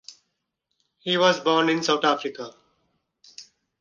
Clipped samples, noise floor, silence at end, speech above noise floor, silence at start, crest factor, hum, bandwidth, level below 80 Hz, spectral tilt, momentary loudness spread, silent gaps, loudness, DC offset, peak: under 0.1%; -78 dBFS; 0.4 s; 56 dB; 0.1 s; 20 dB; none; 9.8 kHz; -72 dBFS; -3.5 dB/octave; 17 LU; none; -22 LUFS; under 0.1%; -6 dBFS